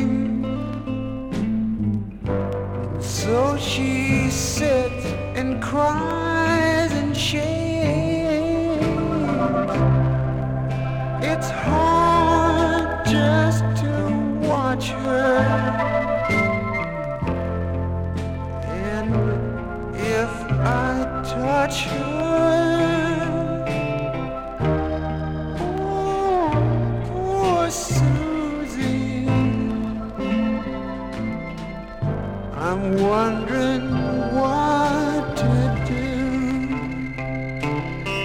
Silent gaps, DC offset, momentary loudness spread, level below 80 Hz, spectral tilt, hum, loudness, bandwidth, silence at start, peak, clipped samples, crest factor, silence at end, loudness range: none; under 0.1%; 9 LU; -36 dBFS; -6 dB/octave; none; -22 LUFS; 17.5 kHz; 0 s; -6 dBFS; under 0.1%; 16 dB; 0 s; 5 LU